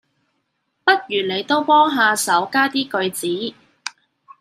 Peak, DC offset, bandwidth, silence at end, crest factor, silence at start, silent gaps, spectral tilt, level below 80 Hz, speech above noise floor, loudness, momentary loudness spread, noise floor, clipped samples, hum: -2 dBFS; under 0.1%; 15.5 kHz; 0.5 s; 18 dB; 0.85 s; none; -2.5 dB/octave; -74 dBFS; 53 dB; -18 LUFS; 17 LU; -71 dBFS; under 0.1%; none